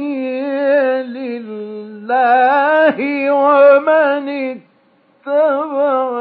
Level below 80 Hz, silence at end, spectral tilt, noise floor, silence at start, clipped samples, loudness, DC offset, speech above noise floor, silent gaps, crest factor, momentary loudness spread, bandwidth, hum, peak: -80 dBFS; 0 s; -8.5 dB/octave; -54 dBFS; 0 s; under 0.1%; -14 LUFS; under 0.1%; 42 dB; none; 14 dB; 17 LU; 4.9 kHz; none; 0 dBFS